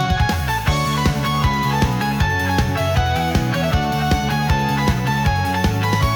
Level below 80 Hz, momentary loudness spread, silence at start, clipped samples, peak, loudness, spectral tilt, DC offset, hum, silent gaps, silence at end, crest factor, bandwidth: -28 dBFS; 1 LU; 0 s; under 0.1%; -6 dBFS; -19 LUFS; -5.5 dB/octave; under 0.1%; none; none; 0 s; 12 dB; 18 kHz